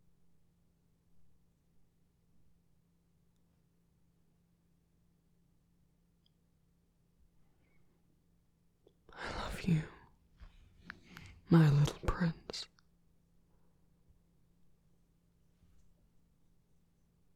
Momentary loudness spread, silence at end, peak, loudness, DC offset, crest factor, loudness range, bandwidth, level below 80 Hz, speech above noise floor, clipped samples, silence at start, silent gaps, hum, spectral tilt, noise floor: 27 LU; 4.7 s; -14 dBFS; -33 LUFS; under 0.1%; 26 dB; 15 LU; 13 kHz; -56 dBFS; 44 dB; under 0.1%; 9.15 s; none; none; -7 dB/octave; -73 dBFS